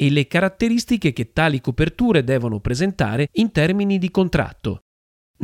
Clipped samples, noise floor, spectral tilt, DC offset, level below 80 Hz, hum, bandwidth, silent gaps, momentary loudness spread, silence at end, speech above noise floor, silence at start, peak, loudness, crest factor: under 0.1%; under -90 dBFS; -6.5 dB/octave; under 0.1%; -38 dBFS; none; 15.5 kHz; 4.82-5.34 s; 5 LU; 0 s; over 71 dB; 0 s; -2 dBFS; -20 LUFS; 18 dB